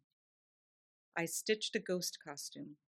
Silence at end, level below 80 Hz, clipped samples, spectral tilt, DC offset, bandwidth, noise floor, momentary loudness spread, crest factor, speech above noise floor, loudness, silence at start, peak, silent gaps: 0.2 s; -90 dBFS; under 0.1%; -2.5 dB/octave; under 0.1%; 14.5 kHz; under -90 dBFS; 11 LU; 22 dB; over 50 dB; -39 LUFS; 1.15 s; -20 dBFS; none